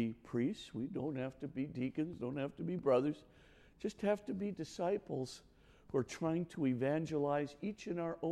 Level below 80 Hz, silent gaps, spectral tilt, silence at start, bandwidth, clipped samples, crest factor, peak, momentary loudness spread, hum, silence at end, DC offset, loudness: -68 dBFS; none; -7 dB/octave; 0 s; 12.5 kHz; under 0.1%; 18 dB; -22 dBFS; 9 LU; none; 0 s; under 0.1%; -39 LUFS